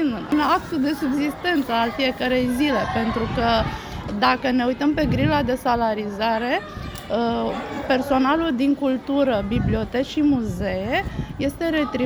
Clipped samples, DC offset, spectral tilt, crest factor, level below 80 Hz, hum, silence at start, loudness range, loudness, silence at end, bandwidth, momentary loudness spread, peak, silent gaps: under 0.1%; under 0.1%; -6 dB/octave; 18 dB; -38 dBFS; none; 0 s; 1 LU; -22 LUFS; 0 s; over 20 kHz; 6 LU; -4 dBFS; none